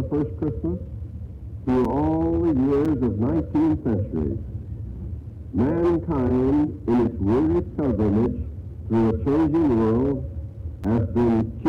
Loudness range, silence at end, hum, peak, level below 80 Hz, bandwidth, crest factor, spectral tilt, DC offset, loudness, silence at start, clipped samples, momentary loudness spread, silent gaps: 2 LU; 0 s; none; -16 dBFS; -36 dBFS; 6.2 kHz; 6 dB; -10.5 dB/octave; under 0.1%; -23 LUFS; 0 s; under 0.1%; 14 LU; none